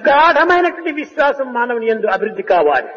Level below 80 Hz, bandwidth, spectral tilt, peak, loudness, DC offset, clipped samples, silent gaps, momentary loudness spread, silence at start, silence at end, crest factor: -52 dBFS; 7.2 kHz; -5 dB/octave; -2 dBFS; -15 LUFS; under 0.1%; under 0.1%; none; 9 LU; 0 s; 0 s; 12 dB